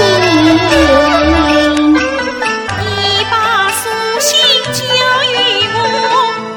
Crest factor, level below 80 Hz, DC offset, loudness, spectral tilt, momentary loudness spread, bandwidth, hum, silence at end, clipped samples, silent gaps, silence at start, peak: 10 dB; -30 dBFS; under 0.1%; -10 LUFS; -3 dB/octave; 7 LU; 19.5 kHz; none; 0 s; under 0.1%; none; 0 s; 0 dBFS